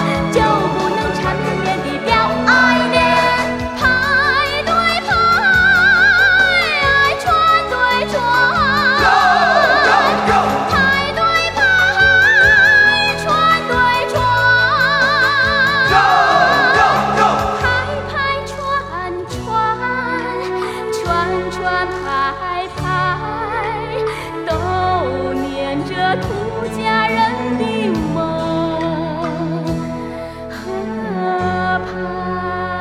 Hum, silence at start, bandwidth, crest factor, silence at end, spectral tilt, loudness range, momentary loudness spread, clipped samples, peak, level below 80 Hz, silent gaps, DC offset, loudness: none; 0 s; 15.5 kHz; 14 dB; 0 s; -4.5 dB/octave; 9 LU; 11 LU; under 0.1%; 0 dBFS; -36 dBFS; none; under 0.1%; -14 LUFS